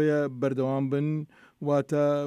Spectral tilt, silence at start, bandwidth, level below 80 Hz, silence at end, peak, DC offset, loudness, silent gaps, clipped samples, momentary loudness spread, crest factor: -8.5 dB/octave; 0 s; 11 kHz; -76 dBFS; 0 s; -14 dBFS; under 0.1%; -28 LUFS; none; under 0.1%; 9 LU; 14 dB